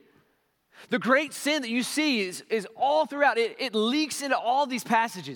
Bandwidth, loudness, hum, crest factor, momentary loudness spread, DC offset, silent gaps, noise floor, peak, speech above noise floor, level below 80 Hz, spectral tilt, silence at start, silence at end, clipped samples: 18 kHz; -26 LUFS; none; 18 dB; 6 LU; under 0.1%; none; -70 dBFS; -8 dBFS; 44 dB; -86 dBFS; -3 dB/octave; 0.8 s; 0 s; under 0.1%